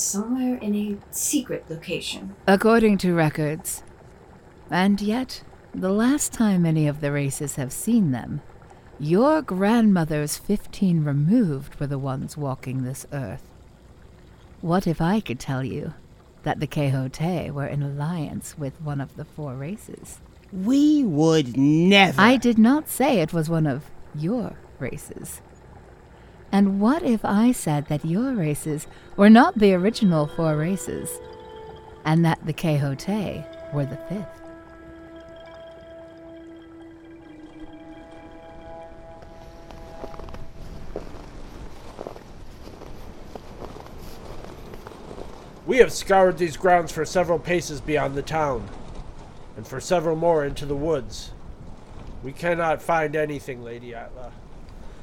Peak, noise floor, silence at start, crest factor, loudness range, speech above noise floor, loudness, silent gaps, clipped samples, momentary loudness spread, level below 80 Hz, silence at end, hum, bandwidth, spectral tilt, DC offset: -2 dBFS; -48 dBFS; 0 s; 22 dB; 22 LU; 26 dB; -22 LUFS; none; under 0.1%; 24 LU; -46 dBFS; 0 s; none; 20 kHz; -5.5 dB/octave; under 0.1%